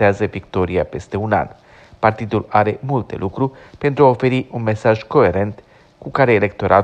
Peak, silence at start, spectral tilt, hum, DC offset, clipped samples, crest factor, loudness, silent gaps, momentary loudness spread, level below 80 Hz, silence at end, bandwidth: 0 dBFS; 0 s; -8 dB/octave; none; under 0.1%; under 0.1%; 16 dB; -18 LUFS; none; 10 LU; -46 dBFS; 0 s; 8.8 kHz